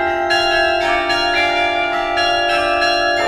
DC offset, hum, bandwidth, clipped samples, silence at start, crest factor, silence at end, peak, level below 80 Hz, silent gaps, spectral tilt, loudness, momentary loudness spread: under 0.1%; none; 14 kHz; under 0.1%; 0 s; 14 dB; 0 s; -2 dBFS; -40 dBFS; none; -2.5 dB/octave; -15 LUFS; 2 LU